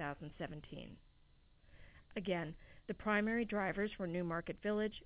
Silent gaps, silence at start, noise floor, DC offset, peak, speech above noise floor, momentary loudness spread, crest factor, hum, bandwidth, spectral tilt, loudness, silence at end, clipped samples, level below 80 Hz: none; 0 s; -68 dBFS; under 0.1%; -24 dBFS; 27 dB; 15 LU; 18 dB; none; 4 kHz; -4.5 dB/octave; -40 LUFS; 0 s; under 0.1%; -62 dBFS